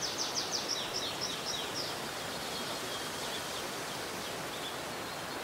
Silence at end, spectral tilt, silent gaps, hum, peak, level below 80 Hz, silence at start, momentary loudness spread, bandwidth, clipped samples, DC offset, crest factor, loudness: 0 s; -1.5 dB/octave; none; none; -20 dBFS; -66 dBFS; 0 s; 5 LU; 16 kHz; under 0.1%; under 0.1%; 18 dB; -36 LUFS